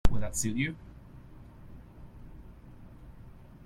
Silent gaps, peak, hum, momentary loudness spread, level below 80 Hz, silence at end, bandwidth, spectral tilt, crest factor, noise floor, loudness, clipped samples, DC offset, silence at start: none; -10 dBFS; none; 21 LU; -40 dBFS; 0.35 s; 15 kHz; -4.5 dB/octave; 22 dB; -50 dBFS; -33 LUFS; under 0.1%; under 0.1%; 0.05 s